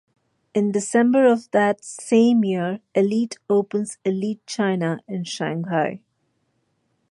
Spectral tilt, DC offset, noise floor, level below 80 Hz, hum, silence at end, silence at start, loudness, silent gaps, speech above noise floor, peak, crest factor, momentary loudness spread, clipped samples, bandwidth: -5.5 dB/octave; under 0.1%; -70 dBFS; -70 dBFS; none; 1.15 s; 0.55 s; -21 LUFS; none; 50 dB; -4 dBFS; 16 dB; 11 LU; under 0.1%; 11.5 kHz